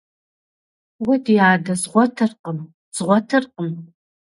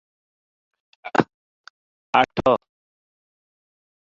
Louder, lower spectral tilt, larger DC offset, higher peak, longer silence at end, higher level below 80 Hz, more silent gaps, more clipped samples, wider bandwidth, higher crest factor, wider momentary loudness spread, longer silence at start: first, -19 LUFS vs -22 LUFS; about the same, -5.5 dB/octave vs -6 dB/octave; neither; about the same, 0 dBFS vs 0 dBFS; second, 0.5 s vs 1.6 s; second, -66 dBFS vs -56 dBFS; second, 2.39-2.44 s, 2.74-2.92 s vs 1.34-1.64 s, 1.70-2.13 s; neither; first, 11.5 kHz vs 7.6 kHz; second, 20 dB vs 26 dB; first, 15 LU vs 11 LU; about the same, 1 s vs 1.05 s